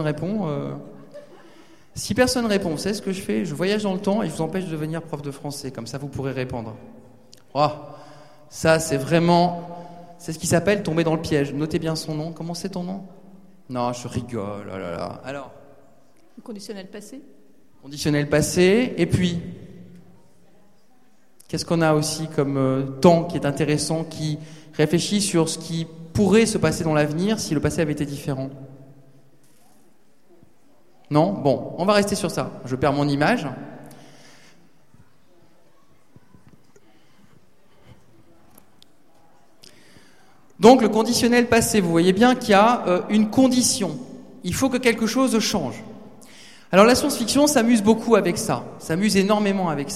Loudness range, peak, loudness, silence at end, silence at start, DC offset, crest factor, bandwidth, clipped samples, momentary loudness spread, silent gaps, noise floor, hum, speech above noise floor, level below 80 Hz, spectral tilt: 12 LU; 0 dBFS; -21 LUFS; 0 s; 0 s; 0.4%; 22 dB; 15.5 kHz; under 0.1%; 17 LU; none; -60 dBFS; none; 39 dB; -50 dBFS; -5 dB/octave